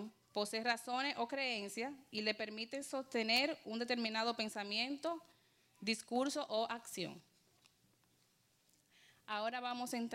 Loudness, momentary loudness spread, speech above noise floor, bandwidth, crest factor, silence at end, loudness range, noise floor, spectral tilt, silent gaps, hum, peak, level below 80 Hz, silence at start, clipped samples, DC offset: -40 LUFS; 9 LU; 35 dB; 16 kHz; 20 dB; 0 s; 8 LU; -76 dBFS; -2.5 dB/octave; none; none; -20 dBFS; -88 dBFS; 0 s; under 0.1%; under 0.1%